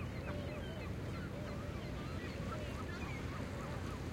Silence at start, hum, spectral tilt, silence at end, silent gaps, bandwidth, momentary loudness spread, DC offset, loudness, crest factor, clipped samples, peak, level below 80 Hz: 0 s; none; -6.5 dB/octave; 0 s; none; 16.5 kHz; 1 LU; under 0.1%; -44 LUFS; 12 dB; under 0.1%; -30 dBFS; -52 dBFS